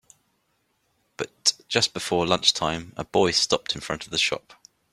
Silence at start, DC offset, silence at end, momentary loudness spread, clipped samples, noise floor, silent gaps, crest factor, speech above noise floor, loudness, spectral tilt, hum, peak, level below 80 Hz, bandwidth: 1.2 s; under 0.1%; 0.55 s; 11 LU; under 0.1%; -71 dBFS; none; 24 dB; 47 dB; -23 LUFS; -2.5 dB/octave; none; -2 dBFS; -58 dBFS; 15.5 kHz